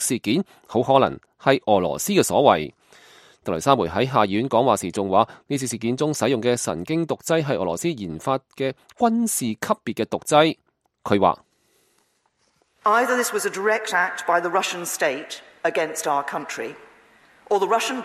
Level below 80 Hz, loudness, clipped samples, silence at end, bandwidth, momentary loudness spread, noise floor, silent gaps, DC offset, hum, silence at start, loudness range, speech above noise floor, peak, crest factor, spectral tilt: -60 dBFS; -22 LUFS; under 0.1%; 0 s; 15.5 kHz; 10 LU; -67 dBFS; none; under 0.1%; none; 0 s; 3 LU; 45 dB; 0 dBFS; 22 dB; -4 dB/octave